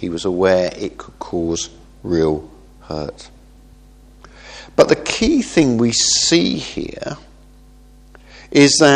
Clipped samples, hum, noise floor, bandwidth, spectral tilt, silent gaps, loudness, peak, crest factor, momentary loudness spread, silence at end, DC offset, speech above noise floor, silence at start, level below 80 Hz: under 0.1%; none; -45 dBFS; 11 kHz; -3.5 dB/octave; none; -16 LUFS; 0 dBFS; 18 dB; 17 LU; 0 s; under 0.1%; 28 dB; 0 s; -42 dBFS